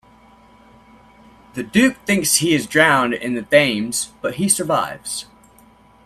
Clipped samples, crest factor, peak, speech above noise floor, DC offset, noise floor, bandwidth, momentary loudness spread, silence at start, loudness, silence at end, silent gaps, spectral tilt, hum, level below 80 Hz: under 0.1%; 20 dB; 0 dBFS; 32 dB; under 0.1%; -50 dBFS; 15.5 kHz; 13 LU; 1.55 s; -17 LUFS; 0.8 s; none; -3 dB/octave; none; -56 dBFS